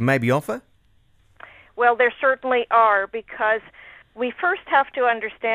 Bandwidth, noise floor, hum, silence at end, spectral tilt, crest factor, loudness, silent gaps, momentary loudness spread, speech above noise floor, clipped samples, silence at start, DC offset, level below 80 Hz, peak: 15.5 kHz; -58 dBFS; none; 0 s; -6 dB/octave; 18 dB; -20 LUFS; none; 12 LU; 38 dB; under 0.1%; 0 s; under 0.1%; -62 dBFS; -4 dBFS